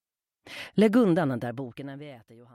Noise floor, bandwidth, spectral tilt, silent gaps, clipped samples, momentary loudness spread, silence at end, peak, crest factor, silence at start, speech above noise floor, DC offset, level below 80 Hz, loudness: -57 dBFS; 15 kHz; -7.5 dB/octave; none; under 0.1%; 22 LU; 0.4 s; -8 dBFS; 18 dB; 0.45 s; 31 dB; under 0.1%; -68 dBFS; -25 LUFS